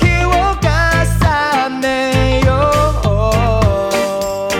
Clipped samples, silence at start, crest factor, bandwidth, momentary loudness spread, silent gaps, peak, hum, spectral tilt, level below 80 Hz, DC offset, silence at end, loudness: under 0.1%; 0 s; 10 dB; 16.5 kHz; 4 LU; none; -2 dBFS; none; -5.5 dB/octave; -20 dBFS; under 0.1%; 0 s; -14 LUFS